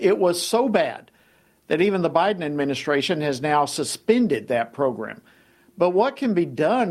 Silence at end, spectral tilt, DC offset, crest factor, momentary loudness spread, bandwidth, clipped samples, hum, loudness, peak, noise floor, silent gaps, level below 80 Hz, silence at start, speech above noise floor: 0 s; -5 dB/octave; under 0.1%; 18 dB; 6 LU; 14.5 kHz; under 0.1%; none; -22 LUFS; -4 dBFS; -59 dBFS; none; -66 dBFS; 0 s; 38 dB